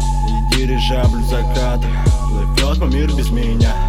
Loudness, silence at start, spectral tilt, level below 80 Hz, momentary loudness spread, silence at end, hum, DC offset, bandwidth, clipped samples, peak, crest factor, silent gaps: -17 LUFS; 0 s; -5.5 dB/octave; -16 dBFS; 3 LU; 0 s; none; under 0.1%; 14.5 kHz; under 0.1%; -2 dBFS; 12 dB; none